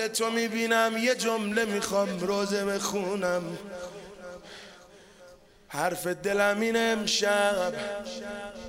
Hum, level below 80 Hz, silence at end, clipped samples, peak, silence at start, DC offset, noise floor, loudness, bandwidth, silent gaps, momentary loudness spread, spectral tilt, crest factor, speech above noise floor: none; -62 dBFS; 0 s; under 0.1%; -10 dBFS; 0 s; under 0.1%; -53 dBFS; -27 LUFS; 16 kHz; none; 18 LU; -3 dB/octave; 18 dB; 25 dB